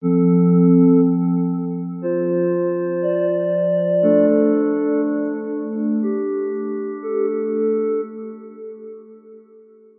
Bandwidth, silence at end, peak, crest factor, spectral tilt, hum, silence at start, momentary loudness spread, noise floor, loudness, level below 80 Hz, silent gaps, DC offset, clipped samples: 3.1 kHz; 0.6 s; -4 dBFS; 14 dB; -14.5 dB/octave; none; 0 s; 13 LU; -47 dBFS; -19 LUFS; -86 dBFS; none; under 0.1%; under 0.1%